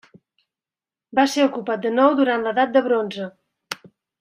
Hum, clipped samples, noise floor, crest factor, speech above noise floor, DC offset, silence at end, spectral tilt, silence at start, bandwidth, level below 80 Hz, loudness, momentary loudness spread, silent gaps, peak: none; under 0.1%; under -90 dBFS; 20 dB; over 71 dB; under 0.1%; 0.35 s; -4.5 dB/octave; 1.15 s; 15 kHz; -72 dBFS; -20 LUFS; 17 LU; none; -2 dBFS